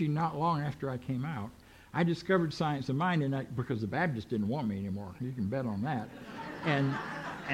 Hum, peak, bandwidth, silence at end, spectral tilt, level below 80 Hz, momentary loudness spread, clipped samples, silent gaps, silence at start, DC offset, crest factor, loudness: none; -14 dBFS; 15 kHz; 0 s; -7.5 dB/octave; -62 dBFS; 9 LU; under 0.1%; none; 0 s; under 0.1%; 18 dB; -33 LUFS